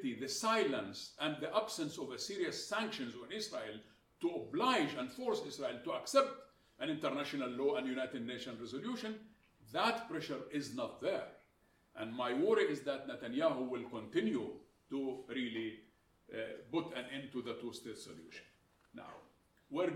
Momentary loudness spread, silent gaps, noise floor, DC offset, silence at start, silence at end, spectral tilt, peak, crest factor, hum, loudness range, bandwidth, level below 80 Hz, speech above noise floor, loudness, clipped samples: 16 LU; none; -73 dBFS; under 0.1%; 0 s; 0 s; -4 dB/octave; -18 dBFS; 22 dB; none; 6 LU; 16.5 kHz; -78 dBFS; 34 dB; -39 LUFS; under 0.1%